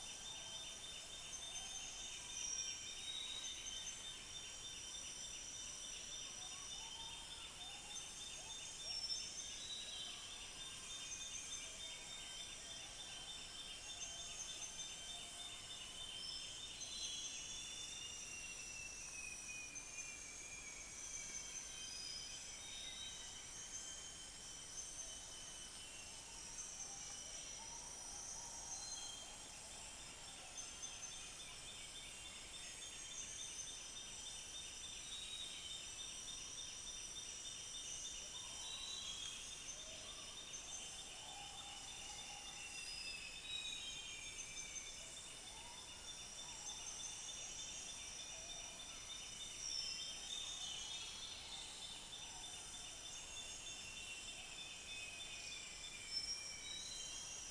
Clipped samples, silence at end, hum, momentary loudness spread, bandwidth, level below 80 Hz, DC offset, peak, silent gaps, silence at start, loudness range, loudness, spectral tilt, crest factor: under 0.1%; 0 s; none; 5 LU; 11 kHz; -68 dBFS; under 0.1%; -32 dBFS; none; 0 s; 3 LU; -48 LUFS; 0.5 dB/octave; 18 dB